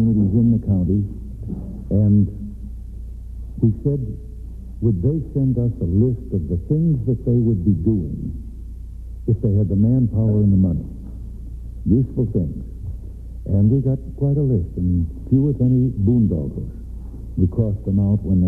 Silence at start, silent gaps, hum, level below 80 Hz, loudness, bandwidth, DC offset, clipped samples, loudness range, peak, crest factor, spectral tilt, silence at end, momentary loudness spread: 0 s; none; none; -32 dBFS; -20 LUFS; 1.3 kHz; under 0.1%; under 0.1%; 3 LU; -4 dBFS; 14 dB; -13.5 dB/octave; 0 s; 18 LU